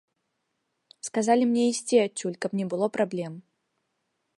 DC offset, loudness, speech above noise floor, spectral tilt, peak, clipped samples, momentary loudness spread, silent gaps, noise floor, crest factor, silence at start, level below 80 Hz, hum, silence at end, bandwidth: under 0.1%; -26 LUFS; 53 dB; -4.5 dB/octave; -8 dBFS; under 0.1%; 14 LU; none; -78 dBFS; 20 dB; 1.05 s; -80 dBFS; none; 1 s; 11.5 kHz